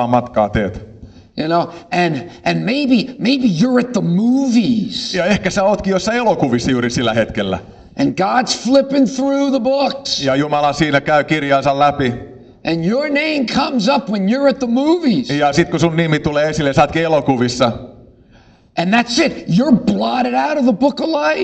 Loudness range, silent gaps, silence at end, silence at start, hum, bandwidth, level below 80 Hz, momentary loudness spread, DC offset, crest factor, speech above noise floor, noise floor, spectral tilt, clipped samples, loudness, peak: 2 LU; none; 0 s; 0 s; none; 8.8 kHz; -42 dBFS; 6 LU; under 0.1%; 14 dB; 32 dB; -47 dBFS; -5.5 dB/octave; under 0.1%; -15 LUFS; 0 dBFS